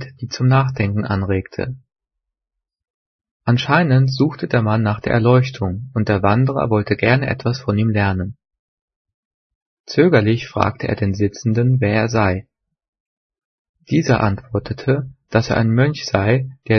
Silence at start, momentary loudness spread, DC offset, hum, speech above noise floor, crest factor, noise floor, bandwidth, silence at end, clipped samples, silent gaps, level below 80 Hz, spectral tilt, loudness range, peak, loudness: 0 s; 8 LU; under 0.1%; none; 66 dB; 18 dB; -83 dBFS; 6.6 kHz; 0 s; under 0.1%; 2.90-3.19 s, 3.31-3.40 s, 8.59-8.88 s, 8.96-9.05 s, 9.14-9.84 s, 12.88-12.93 s, 13.00-13.30 s, 13.44-13.74 s; -48 dBFS; -7.5 dB/octave; 4 LU; 0 dBFS; -18 LUFS